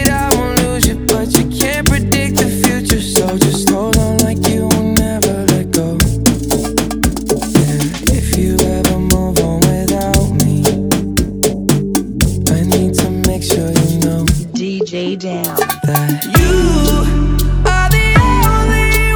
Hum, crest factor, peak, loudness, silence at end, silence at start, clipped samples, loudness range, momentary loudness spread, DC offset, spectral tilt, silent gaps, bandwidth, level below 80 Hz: none; 12 dB; 0 dBFS; -13 LUFS; 0 s; 0 s; 0.2%; 2 LU; 4 LU; under 0.1%; -5 dB/octave; none; over 20 kHz; -20 dBFS